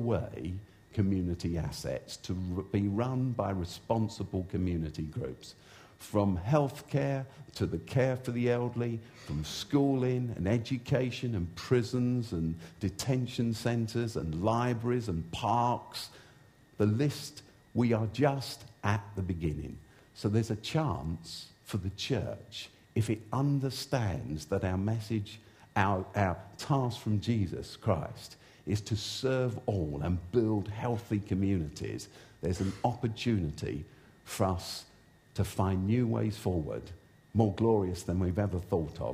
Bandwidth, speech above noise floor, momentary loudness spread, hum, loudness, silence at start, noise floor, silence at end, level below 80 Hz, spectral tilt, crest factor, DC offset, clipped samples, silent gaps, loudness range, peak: 15.5 kHz; 28 dB; 11 LU; none; -33 LUFS; 0 s; -59 dBFS; 0 s; -52 dBFS; -6.5 dB/octave; 20 dB; under 0.1%; under 0.1%; none; 3 LU; -12 dBFS